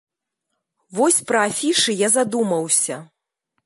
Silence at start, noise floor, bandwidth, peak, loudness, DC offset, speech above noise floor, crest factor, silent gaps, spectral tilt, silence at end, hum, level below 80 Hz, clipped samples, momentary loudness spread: 0.9 s; -78 dBFS; 12 kHz; -4 dBFS; -18 LUFS; under 0.1%; 59 dB; 18 dB; none; -2 dB/octave; 0.6 s; none; -74 dBFS; under 0.1%; 7 LU